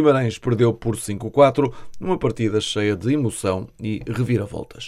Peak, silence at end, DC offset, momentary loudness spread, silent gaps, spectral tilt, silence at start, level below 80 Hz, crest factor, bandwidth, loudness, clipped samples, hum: -2 dBFS; 0 s; under 0.1%; 11 LU; none; -6 dB/octave; 0 s; -46 dBFS; 18 dB; 14.5 kHz; -21 LUFS; under 0.1%; none